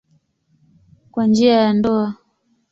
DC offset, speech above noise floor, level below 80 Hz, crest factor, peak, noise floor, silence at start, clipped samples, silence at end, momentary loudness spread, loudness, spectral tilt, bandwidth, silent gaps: under 0.1%; 49 dB; -56 dBFS; 16 dB; -4 dBFS; -64 dBFS; 1.15 s; under 0.1%; 0.55 s; 15 LU; -17 LUFS; -6.5 dB/octave; 7.6 kHz; none